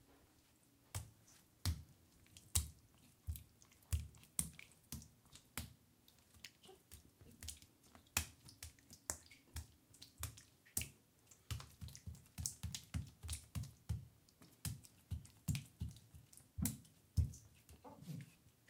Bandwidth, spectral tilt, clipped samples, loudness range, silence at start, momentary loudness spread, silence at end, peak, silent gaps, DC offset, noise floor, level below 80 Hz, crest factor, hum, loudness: 17.5 kHz; -3.5 dB/octave; under 0.1%; 4 LU; 0.1 s; 22 LU; 0.2 s; -14 dBFS; none; under 0.1%; -72 dBFS; -58 dBFS; 36 dB; none; -48 LUFS